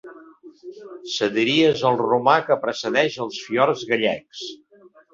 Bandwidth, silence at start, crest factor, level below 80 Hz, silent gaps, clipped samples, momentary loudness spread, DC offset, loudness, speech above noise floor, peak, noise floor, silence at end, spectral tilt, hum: 7.6 kHz; 0.05 s; 20 dB; -66 dBFS; none; under 0.1%; 18 LU; under 0.1%; -20 LUFS; 24 dB; -2 dBFS; -45 dBFS; 0.6 s; -4.5 dB/octave; none